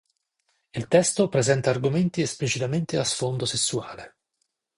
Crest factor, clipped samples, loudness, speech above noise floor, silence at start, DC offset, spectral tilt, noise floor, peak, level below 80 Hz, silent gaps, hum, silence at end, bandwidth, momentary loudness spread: 20 dB; under 0.1%; -24 LUFS; 53 dB; 0.75 s; under 0.1%; -4.5 dB/octave; -77 dBFS; -4 dBFS; -58 dBFS; none; none; 0.7 s; 11.5 kHz; 13 LU